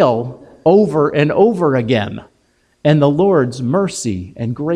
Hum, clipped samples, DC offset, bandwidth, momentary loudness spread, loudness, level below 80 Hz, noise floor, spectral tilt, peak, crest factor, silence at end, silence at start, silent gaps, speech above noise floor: none; under 0.1%; under 0.1%; 11.5 kHz; 11 LU; -15 LUFS; -50 dBFS; -59 dBFS; -6.5 dB/octave; 0 dBFS; 14 dB; 0 s; 0 s; none; 45 dB